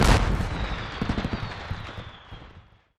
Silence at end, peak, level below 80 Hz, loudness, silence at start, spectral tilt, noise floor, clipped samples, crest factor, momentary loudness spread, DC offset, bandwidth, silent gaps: 0.4 s; -4 dBFS; -30 dBFS; -29 LUFS; 0 s; -5.5 dB/octave; -52 dBFS; under 0.1%; 22 dB; 21 LU; under 0.1%; 14 kHz; none